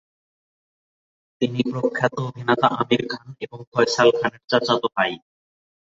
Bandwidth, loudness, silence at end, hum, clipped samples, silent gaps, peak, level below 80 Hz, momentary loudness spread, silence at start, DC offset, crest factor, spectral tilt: 7.8 kHz; -21 LUFS; 0.75 s; none; under 0.1%; 3.67-3.72 s; -2 dBFS; -64 dBFS; 13 LU; 1.4 s; under 0.1%; 22 dB; -5 dB/octave